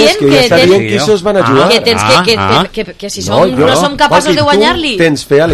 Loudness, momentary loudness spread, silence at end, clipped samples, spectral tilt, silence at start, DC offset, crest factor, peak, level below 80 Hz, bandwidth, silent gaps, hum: -8 LUFS; 5 LU; 0 s; 0.9%; -4.5 dB/octave; 0 s; under 0.1%; 8 dB; 0 dBFS; -36 dBFS; 16 kHz; none; none